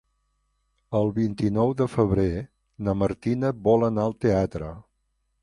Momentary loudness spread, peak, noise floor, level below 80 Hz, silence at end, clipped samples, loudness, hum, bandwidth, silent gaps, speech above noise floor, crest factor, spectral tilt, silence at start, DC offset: 11 LU; -6 dBFS; -73 dBFS; -44 dBFS; 0.6 s; under 0.1%; -24 LUFS; 50 Hz at -50 dBFS; 11 kHz; none; 50 dB; 18 dB; -9 dB/octave; 0.9 s; under 0.1%